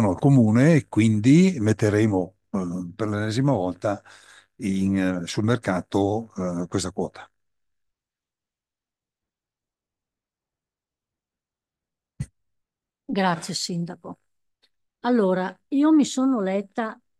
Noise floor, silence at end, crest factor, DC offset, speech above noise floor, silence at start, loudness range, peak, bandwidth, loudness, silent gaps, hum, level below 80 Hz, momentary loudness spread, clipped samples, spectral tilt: under -90 dBFS; 0.25 s; 18 dB; under 0.1%; over 68 dB; 0 s; 12 LU; -6 dBFS; 12.5 kHz; -23 LUFS; none; none; -62 dBFS; 14 LU; under 0.1%; -6.5 dB/octave